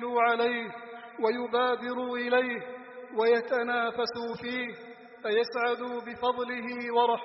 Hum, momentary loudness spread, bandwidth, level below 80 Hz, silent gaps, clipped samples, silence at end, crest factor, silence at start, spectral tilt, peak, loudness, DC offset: none; 13 LU; 5.8 kHz; -74 dBFS; none; under 0.1%; 0 s; 16 dB; 0 s; -1 dB/octave; -12 dBFS; -29 LUFS; under 0.1%